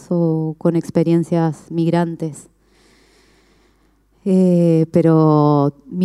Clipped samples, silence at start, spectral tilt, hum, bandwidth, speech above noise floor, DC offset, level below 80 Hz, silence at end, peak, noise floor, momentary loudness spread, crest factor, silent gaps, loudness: under 0.1%; 0.1 s; -9 dB/octave; none; 11.5 kHz; 42 dB; under 0.1%; -58 dBFS; 0 s; -4 dBFS; -57 dBFS; 8 LU; 14 dB; none; -16 LUFS